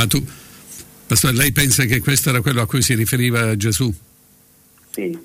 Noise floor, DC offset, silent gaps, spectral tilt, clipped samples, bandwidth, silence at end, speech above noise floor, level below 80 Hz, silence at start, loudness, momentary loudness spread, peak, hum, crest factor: -51 dBFS; under 0.1%; none; -4 dB/octave; under 0.1%; 16.5 kHz; 0 s; 34 dB; -40 dBFS; 0 s; -16 LUFS; 19 LU; -4 dBFS; none; 14 dB